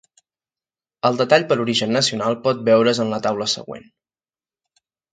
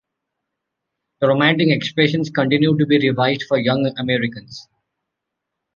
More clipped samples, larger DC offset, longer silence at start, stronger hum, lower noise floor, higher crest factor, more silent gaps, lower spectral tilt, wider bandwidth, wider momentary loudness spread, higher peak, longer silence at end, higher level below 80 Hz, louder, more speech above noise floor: neither; neither; second, 1.05 s vs 1.2 s; neither; first, under -90 dBFS vs -80 dBFS; about the same, 20 dB vs 18 dB; neither; second, -4 dB/octave vs -7 dB/octave; first, 9.4 kHz vs 7.2 kHz; about the same, 7 LU vs 8 LU; about the same, -2 dBFS vs -2 dBFS; first, 1.35 s vs 1.15 s; second, -66 dBFS vs -60 dBFS; about the same, -19 LUFS vs -17 LUFS; first, over 71 dB vs 63 dB